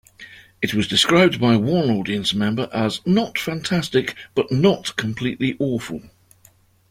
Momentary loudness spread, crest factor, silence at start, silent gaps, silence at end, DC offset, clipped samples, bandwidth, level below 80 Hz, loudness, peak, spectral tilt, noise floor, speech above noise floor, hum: 10 LU; 18 dB; 0.2 s; none; 0.85 s; under 0.1%; under 0.1%; 16 kHz; -52 dBFS; -20 LUFS; -2 dBFS; -5 dB/octave; -55 dBFS; 35 dB; none